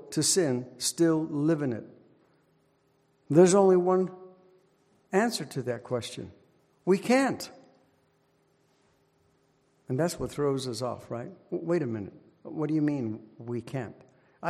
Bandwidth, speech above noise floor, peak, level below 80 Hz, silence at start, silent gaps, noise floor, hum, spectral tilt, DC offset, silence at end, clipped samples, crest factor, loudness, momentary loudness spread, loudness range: 15.5 kHz; 41 dB; -8 dBFS; -66 dBFS; 0 s; none; -68 dBFS; none; -5 dB/octave; under 0.1%; 0 s; under 0.1%; 22 dB; -28 LUFS; 17 LU; 8 LU